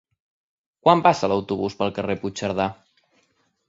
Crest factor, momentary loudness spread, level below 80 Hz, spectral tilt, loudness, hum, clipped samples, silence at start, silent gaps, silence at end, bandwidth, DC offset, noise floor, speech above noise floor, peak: 22 dB; 10 LU; -56 dBFS; -5.5 dB/octave; -22 LUFS; none; under 0.1%; 0.85 s; none; 0.95 s; 7.8 kHz; under 0.1%; -67 dBFS; 46 dB; -2 dBFS